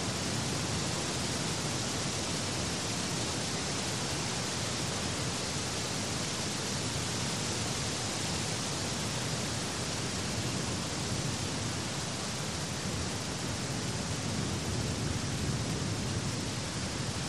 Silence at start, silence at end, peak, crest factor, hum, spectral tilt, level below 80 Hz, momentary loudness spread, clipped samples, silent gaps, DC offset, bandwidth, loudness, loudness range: 0 s; 0 s; -20 dBFS; 14 dB; none; -3.5 dB/octave; -50 dBFS; 2 LU; under 0.1%; none; 0.2%; 13.5 kHz; -33 LUFS; 2 LU